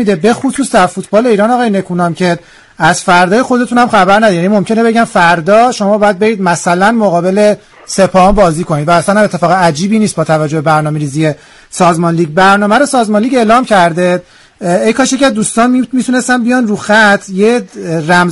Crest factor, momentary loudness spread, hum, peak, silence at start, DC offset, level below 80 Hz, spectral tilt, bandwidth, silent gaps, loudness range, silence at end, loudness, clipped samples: 10 dB; 6 LU; none; 0 dBFS; 0 s; under 0.1%; -36 dBFS; -5 dB/octave; 12 kHz; none; 2 LU; 0 s; -9 LUFS; 0.2%